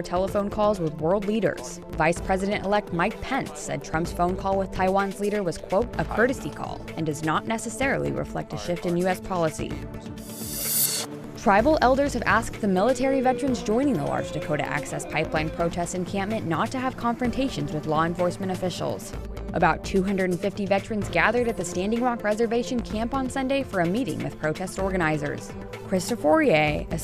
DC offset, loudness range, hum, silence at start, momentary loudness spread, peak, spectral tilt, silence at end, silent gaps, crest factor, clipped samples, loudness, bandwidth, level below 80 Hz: under 0.1%; 4 LU; none; 0 s; 9 LU; -6 dBFS; -5 dB/octave; 0 s; none; 20 dB; under 0.1%; -25 LUFS; 15.5 kHz; -42 dBFS